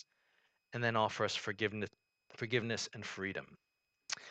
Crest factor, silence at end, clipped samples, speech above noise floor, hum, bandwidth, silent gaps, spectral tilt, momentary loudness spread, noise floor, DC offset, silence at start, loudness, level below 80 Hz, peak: 22 dB; 0 s; under 0.1%; 39 dB; none; 9 kHz; none; -4 dB/octave; 13 LU; -77 dBFS; under 0.1%; 0.7 s; -38 LUFS; -76 dBFS; -18 dBFS